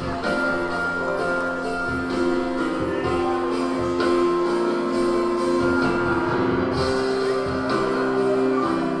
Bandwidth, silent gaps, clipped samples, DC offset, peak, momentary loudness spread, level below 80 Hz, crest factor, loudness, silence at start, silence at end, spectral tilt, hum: 11 kHz; none; under 0.1%; under 0.1%; -10 dBFS; 4 LU; -44 dBFS; 12 dB; -22 LUFS; 0 s; 0 s; -6 dB/octave; none